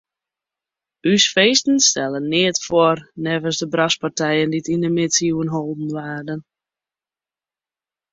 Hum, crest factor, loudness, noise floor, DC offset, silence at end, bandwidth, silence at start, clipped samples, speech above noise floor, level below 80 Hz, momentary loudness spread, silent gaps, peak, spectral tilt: none; 20 dB; -18 LUFS; under -90 dBFS; under 0.1%; 1.7 s; 7.8 kHz; 1.05 s; under 0.1%; over 71 dB; -60 dBFS; 12 LU; none; -2 dBFS; -3 dB/octave